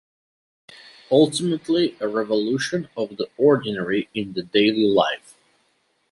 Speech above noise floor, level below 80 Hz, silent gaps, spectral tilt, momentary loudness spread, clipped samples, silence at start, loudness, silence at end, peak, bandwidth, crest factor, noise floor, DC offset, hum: 46 dB; -64 dBFS; none; -5 dB/octave; 10 LU; under 0.1%; 1.1 s; -21 LUFS; 0.95 s; -4 dBFS; 11.5 kHz; 18 dB; -67 dBFS; under 0.1%; none